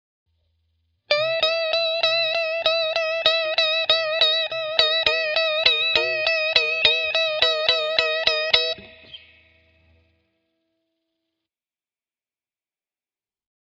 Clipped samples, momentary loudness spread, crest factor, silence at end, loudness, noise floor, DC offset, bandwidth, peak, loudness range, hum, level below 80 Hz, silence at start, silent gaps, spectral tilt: under 0.1%; 4 LU; 24 dB; 4.55 s; -19 LUFS; under -90 dBFS; under 0.1%; 8.6 kHz; 0 dBFS; 6 LU; none; -60 dBFS; 1.1 s; none; -1 dB/octave